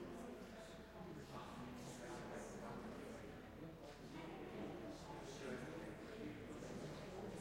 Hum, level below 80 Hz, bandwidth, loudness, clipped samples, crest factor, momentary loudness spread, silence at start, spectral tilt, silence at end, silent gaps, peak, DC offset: none; -68 dBFS; 16 kHz; -53 LUFS; under 0.1%; 14 dB; 5 LU; 0 s; -5.5 dB/octave; 0 s; none; -38 dBFS; under 0.1%